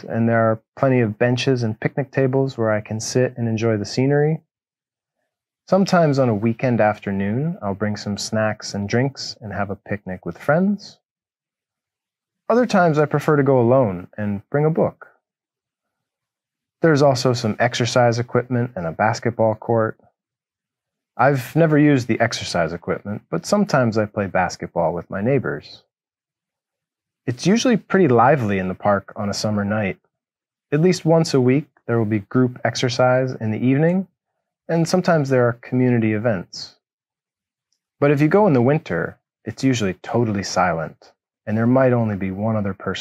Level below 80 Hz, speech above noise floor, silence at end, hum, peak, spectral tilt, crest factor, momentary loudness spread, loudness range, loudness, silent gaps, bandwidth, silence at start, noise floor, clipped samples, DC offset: -60 dBFS; over 71 dB; 0 s; none; -2 dBFS; -6.5 dB/octave; 18 dB; 11 LU; 4 LU; -19 LUFS; 0.68-0.72 s, 11.11-11.16 s, 36.93-36.99 s; 13.5 kHz; 0.05 s; under -90 dBFS; under 0.1%; under 0.1%